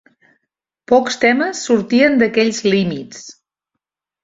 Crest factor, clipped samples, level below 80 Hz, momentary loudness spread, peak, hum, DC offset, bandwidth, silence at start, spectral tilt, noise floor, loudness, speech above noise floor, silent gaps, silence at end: 16 dB; under 0.1%; -56 dBFS; 13 LU; -2 dBFS; none; under 0.1%; 7.8 kHz; 0.9 s; -4.5 dB/octave; -80 dBFS; -15 LUFS; 65 dB; none; 0.9 s